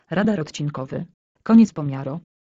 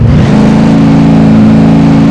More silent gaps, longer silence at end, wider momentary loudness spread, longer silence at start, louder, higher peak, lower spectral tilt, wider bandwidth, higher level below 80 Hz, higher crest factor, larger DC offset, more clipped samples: first, 1.14-1.35 s vs none; first, 0.3 s vs 0 s; first, 17 LU vs 1 LU; about the same, 0.1 s vs 0 s; second, -20 LUFS vs -4 LUFS; second, -4 dBFS vs 0 dBFS; second, -7 dB/octave vs -8.5 dB/octave; second, 7.6 kHz vs 9.2 kHz; second, -58 dBFS vs -20 dBFS; first, 16 dB vs 4 dB; neither; second, under 0.1% vs 20%